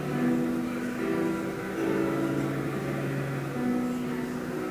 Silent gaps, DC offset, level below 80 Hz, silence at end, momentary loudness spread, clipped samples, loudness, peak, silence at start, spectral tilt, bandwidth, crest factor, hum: none; under 0.1%; -56 dBFS; 0 s; 5 LU; under 0.1%; -30 LUFS; -16 dBFS; 0 s; -7 dB/octave; 16 kHz; 14 dB; none